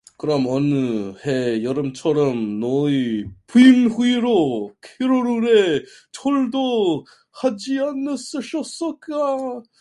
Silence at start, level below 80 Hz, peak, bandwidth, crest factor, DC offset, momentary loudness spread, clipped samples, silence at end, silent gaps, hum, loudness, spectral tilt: 0.25 s; -60 dBFS; 0 dBFS; 11.5 kHz; 18 dB; under 0.1%; 11 LU; under 0.1%; 0.2 s; none; none; -20 LUFS; -6 dB/octave